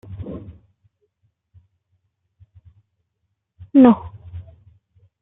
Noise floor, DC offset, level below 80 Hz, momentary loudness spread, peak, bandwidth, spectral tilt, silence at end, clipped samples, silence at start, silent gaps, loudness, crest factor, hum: -75 dBFS; under 0.1%; -52 dBFS; 26 LU; -2 dBFS; 3.8 kHz; -11.5 dB/octave; 0.8 s; under 0.1%; 0.1 s; none; -15 LUFS; 22 dB; none